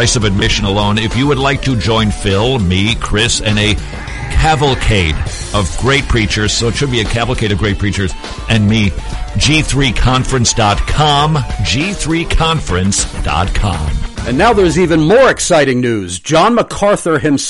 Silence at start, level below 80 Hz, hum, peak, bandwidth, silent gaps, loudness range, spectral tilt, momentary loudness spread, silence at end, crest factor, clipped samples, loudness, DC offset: 0 s; -22 dBFS; none; 0 dBFS; 11.5 kHz; none; 3 LU; -4.5 dB/octave; 7 LU; 0 s; 12 dB; under 0.1%; -13 LUFS; under 0.1%